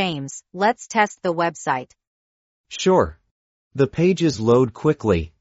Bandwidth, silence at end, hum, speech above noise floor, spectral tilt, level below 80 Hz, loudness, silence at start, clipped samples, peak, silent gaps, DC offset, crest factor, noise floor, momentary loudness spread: 8 kHz; 0.15 s; none; over 70 dB; -5 dB/octave; -48 dBFS; -20 LUFS; 0 s; under 0.1%; -2 dBFS; 2.07-2.64 s, 3.31-3.71 s; under 0.1%; 18 dB; under -90 dBFS; 9 LU